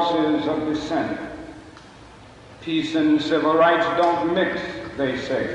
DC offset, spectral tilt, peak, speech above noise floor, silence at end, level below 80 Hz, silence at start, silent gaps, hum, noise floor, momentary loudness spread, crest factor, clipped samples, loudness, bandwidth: under 0.1%; -5.5 dB/octave; -6 dBFS; 24 dB; 0 s; -52 dBFS; 0 s; none; none; -44 dBFS; 17 LU; 16 dB; under 0.1%; -21 LUFS; 9.6 kHz